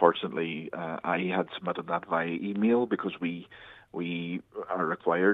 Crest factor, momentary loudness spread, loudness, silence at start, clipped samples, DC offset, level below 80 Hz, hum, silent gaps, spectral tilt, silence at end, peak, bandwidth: 24 dB; 11 LU; -30 LUFS; 0 s; under 0.1%; under 0.1%; -72 dBFS; none; none; -8.5 dB/octave; 0 s; -6 dBFS; 4.1 kHz